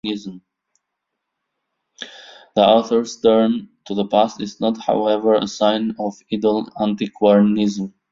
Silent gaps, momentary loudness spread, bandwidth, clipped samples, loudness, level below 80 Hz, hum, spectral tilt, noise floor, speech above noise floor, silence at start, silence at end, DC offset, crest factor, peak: none; 14 LU; 7.6 kHz; under 0.1%; -18 LUFS; -60 dBFS; none; -6 dB/octave; -78 dBFS; 61 dB; 0.05 s; 0.2 s; under 0.1%; 18 dB; -2 dBFS